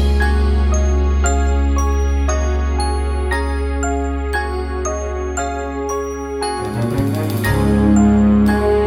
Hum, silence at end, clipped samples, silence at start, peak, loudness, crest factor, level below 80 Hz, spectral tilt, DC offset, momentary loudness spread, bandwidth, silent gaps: none; 0 s; under 0.1%; 0 s; -2 dBFS; -18 LUFS; 14 dB; -18 dBFS; -6.5 dB/octave; under 0.1%; 9 LU; 14.5 kHz; none